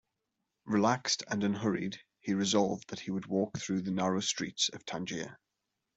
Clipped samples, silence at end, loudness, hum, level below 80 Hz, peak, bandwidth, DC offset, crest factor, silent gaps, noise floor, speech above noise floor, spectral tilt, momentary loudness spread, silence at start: under 0.1%; 0.6 s; -33 LUFS; none; -72 dBFS; -14 dBFS; 8.2 kHz; under 0.1%; 20 dB; none; -85 dBFS; 53 dB; -4 dB/octave; 10 LU; 0.65 s